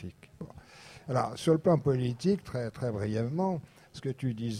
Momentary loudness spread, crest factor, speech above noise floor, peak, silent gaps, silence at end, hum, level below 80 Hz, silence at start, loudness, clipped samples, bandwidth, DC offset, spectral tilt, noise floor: 21 LU; 18 dB; 22 dB; -14 dBFS; none; 0 s; none; -60 dBFS; 0 s; -31 LUFS; under 0.1%; 13.5 kHz; under 0.1%; -7.5 dB/octave; -52 dBFS